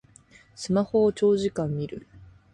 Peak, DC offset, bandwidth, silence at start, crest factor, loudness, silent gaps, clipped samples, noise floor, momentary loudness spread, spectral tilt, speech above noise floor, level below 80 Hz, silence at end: -12 dBFS; under 0.1%; 11 kHz; 0.6 s; 16 dB; -25 LUFS; none; under 0.1%; -55 dBFS; 16 LU; -7 dB/octave; 31 dB; -58 dBFS; 0.3 s